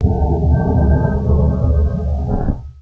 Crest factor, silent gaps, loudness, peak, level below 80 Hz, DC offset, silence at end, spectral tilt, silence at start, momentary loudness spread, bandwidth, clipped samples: 12 dB; none; -16 LUFS; -2 dBFS; -18 dBFS; under 0.1%; 0 s; -11.5 dB/octave; 0 s; 6 LU; 1.8 kHz; under 0.1%